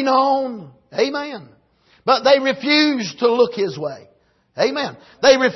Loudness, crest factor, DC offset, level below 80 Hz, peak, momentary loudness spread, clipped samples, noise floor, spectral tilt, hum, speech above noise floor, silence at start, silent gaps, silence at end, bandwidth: -18 LUFS; 16 dB; under 0.1%; -62 dBFS; -2 dBFS; 16 LU; under 0.1%; -57 dBFS; -3.5 dB/octave; none; 39 dB; 0 s; none; 0 s; 6.2 kHz